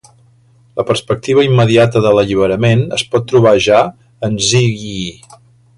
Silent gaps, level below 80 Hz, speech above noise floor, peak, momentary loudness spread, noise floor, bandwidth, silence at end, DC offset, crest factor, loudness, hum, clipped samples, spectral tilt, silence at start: none; -44 dBFS; 37 dB; 0 dBFS; 12 LU; -49 dBFS; 11.5 kHz; 0.65 s; under 0.1%; 12 dB; -12 LUFS; none; under 0.1%; -5.5 dB/octave; 0.75 s